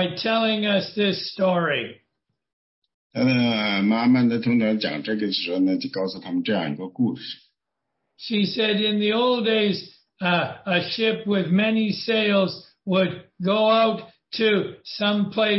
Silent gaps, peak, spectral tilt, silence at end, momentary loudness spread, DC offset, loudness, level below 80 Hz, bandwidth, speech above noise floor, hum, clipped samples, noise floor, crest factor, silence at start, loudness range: 2.53-2.82 s, 2.94-3.10 s; -8 dBFS; -8.5 dB/octave; 0 s; 8 LU; under 0.1%; -22 LUFS; -68 dBFS; 6 kHz; 59 dB; none; under 0.1%; -81 dBFS; 16 dB; 0 s; 4 LU